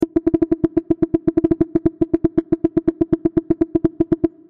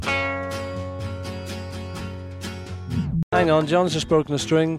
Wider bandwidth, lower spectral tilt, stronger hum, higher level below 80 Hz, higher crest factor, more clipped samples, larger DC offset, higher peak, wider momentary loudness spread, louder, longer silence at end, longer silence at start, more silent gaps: second, 2.8 kHz vs 14.5 kHz; first, -11 dB/octave vs -5.5 dB/octave; neither; about the same, -40 dBFS vs -44 dBFS; about the same, 16 dB vs 18 dB; neither; first, 0.2% vs under 0.1%; about the same, -4 dBFS vs -6 dBFS; second, 1 LU vs 14 LU; first, -19 LUFS vs -24 LUFS; first, 0.2 s vs 0 s; about the same, 0 s vs 0 s; second, none vs 3.23-3.31 s